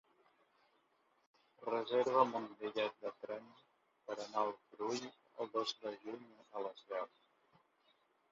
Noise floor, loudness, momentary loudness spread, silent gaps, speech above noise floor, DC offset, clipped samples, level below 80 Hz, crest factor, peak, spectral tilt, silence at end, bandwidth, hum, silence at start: -77 dBFS; -41 LUFS; 16 LU; none; 36 dB; under 0.1%; under 0.1%; under -90 dBFS; 26 dB; -16 dBFS; -2 dB/octave; 1.25 s; 7.2 kHz; none; 1.6 s